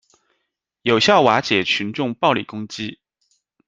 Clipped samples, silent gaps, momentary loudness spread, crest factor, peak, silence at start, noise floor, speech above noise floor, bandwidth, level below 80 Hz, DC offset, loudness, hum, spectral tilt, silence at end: under 0.1%; none; 16 LU; 20 dB; -2 dBFS; 0.85 s; -76 dBFS; 57 dB; 9.4 kHz; -62 dBFS; under 0.1%; -18 LUFS; none; -4.5 dB/octave; 0.75 s